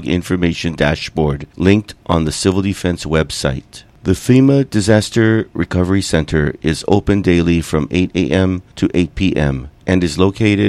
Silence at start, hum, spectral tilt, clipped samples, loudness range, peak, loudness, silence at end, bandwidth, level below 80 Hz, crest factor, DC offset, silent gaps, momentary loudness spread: 0 s; none; -6 dB/octave; under 0.1%; 2 LU; 0 dBFS; -15 LUFS; 0 s; 14 kHz; -32 dBFS; 14 dB; under 0.1%; none; 6 LU